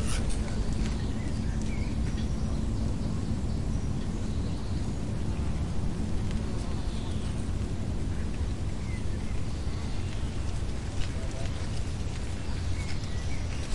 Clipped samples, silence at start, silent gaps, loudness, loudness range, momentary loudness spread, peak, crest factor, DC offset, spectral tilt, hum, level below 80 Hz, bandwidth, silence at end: under 0.1%; 0 s; none; -33 LUFS; 2 LU; 3 LU; -16 dBFS; 14 dB; 2%; -6 dB/octave; none; -34 dBFS; 11.5 kHz; 0 s